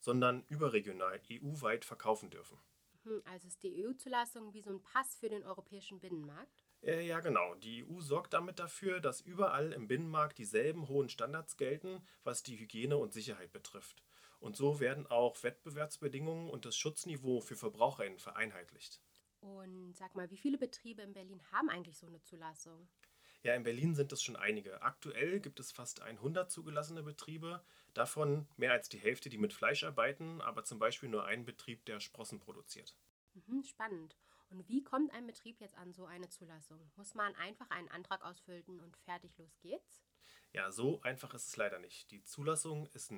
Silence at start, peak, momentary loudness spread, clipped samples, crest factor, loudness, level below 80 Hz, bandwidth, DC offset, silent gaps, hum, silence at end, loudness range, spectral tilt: 0 s; -16 dBFS; 17 LU; under 0.1%; 26 dB; -40 LUFS; -84 dBFS; over 20 kHz; under 0.1%; 33.10-33.27 s; none; 0 s; 7 LU; -4.5 dB/octave